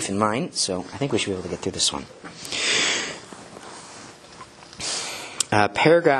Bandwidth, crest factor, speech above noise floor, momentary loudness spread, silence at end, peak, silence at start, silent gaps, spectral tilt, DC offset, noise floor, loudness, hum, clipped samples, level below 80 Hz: 12.5 kHz; 24 dB; 22 dB; 22 LU; 0 s; 0 dBFS; 0 s; none; -3 dB/octave; under 0.1%; -44 dBFS; -23 LUFS; none; under 0.1%; -56 dBFS